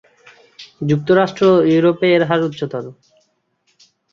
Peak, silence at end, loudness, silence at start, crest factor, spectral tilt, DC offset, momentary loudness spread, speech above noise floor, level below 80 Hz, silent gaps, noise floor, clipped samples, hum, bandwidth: -2 dBFS; 1.2 s; -15 LUFS; 0.6 s; 16 dB; -7.5 dB/octave; under 0.1%; 13 LU; 50 dB; -58 dBFS; none; -64 dBFS; under 0.1%; none; 7.2 kHz